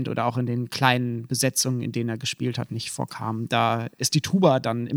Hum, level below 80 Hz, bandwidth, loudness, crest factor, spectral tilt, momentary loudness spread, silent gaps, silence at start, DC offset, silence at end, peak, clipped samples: none; -64 dBFS; 17 kHz; -24 LUFS; 22 dB; -4.5 dB/octave; 10 LU; none; 0 s; under 0.1%; 0 s; -2 dBFS; under 0.1%